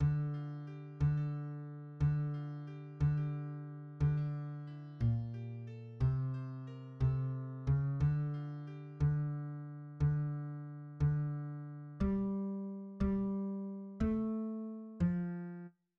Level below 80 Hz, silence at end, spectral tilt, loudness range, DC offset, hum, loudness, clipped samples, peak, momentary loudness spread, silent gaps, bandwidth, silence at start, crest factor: -50 dBFS; 0.3 s; -10.5 dB/octave; 1 LU; under 0.1%; none; -38 LUFS; under 0.1%; -22 dBFS; 12 LU; none; 4.3 kHz; 0 s; 14 dB